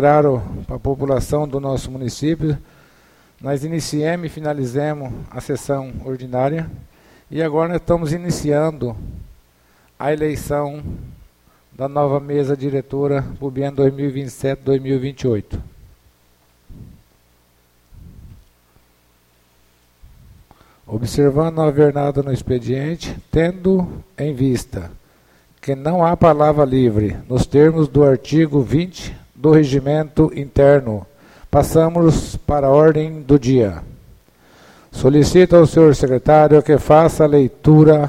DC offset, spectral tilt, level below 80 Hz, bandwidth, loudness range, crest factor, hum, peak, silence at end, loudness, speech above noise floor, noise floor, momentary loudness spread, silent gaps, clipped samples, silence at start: under 0.1%; -7.5 dB/octave; -36 dBFS; 15 kHz; 9 LU; 16 dB; 60 Hz at -50 dBFS; 0 dBFS; 0 s; -16 LUFS; 41 dB; -56 dBFS; 15 LU; none; under 0.1%; 0 s